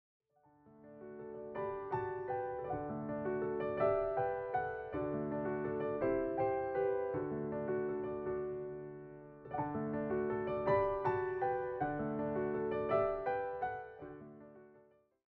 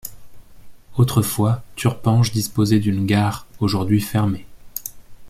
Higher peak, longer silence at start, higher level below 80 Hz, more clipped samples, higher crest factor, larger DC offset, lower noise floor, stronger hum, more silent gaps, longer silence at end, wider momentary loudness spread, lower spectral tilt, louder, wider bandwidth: second, -22 dBFS vs -4 dBFS; first, 0.65 s vs 0.05 s; second, -62 dBFS vs -46 dBFS; neither; about the same, 16 dB vs 16 dB; neither; first, -67 dBFS vs -39 dBFS; neither; neither; first, 0.5 s vs 0 s; first, 16 LU vs 13 LU; about the same, -7 dB/octave vs -6 dB/octave; second, -38 LUFS vs -20 LUFS; second, 4.3 kHz vs 16 kHz